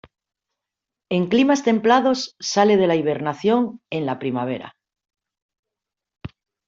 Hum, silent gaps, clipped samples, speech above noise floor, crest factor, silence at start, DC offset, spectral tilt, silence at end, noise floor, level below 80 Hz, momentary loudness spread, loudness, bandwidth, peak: none; 5.42-5.49 s, 5.59-5.63 s; under 0.1%; 67 dB; 18 dB; 1.1 s; under 0.1%; -5 dB/octave; 0.4 s; -86 dBFS; -62 dBFS; 15 LU; -20 LUFS; 7.6 kHz; -4 dBFS